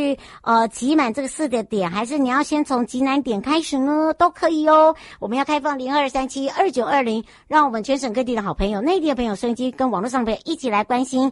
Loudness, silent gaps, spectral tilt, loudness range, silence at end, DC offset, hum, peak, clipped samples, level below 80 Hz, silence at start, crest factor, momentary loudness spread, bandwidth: -20 LUFS; none; -4.5 dB/octave; 3 LU; 0 s; under 0.1%; none; -4 dBFS; under 0.1%; -44 dBFS; 0 s; 16 dB; 6 LU; 11.5 kHz